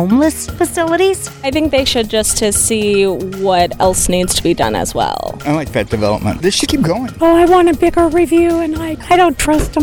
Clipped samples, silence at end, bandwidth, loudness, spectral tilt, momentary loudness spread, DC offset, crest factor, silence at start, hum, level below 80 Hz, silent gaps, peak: under 0.1%; 0 s; 19 kHz; -13 LUFS; -4 dB/octave; 7 LU; under 0.1%; 12 dB; 0 s; none; -30 dBFS; none; -2 dBFS